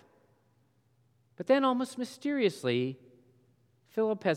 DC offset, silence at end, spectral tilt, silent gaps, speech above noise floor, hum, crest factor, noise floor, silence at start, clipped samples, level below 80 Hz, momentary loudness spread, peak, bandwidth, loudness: under 0.1%; 0 s; -6 dB/octave; none; 40 dB; none; 20 dB; -70 dBFS; 1.4 s; under 0.1%; -88 dBFS; 12 LU; -14 dBFS; 14 kHz; -31 LUFS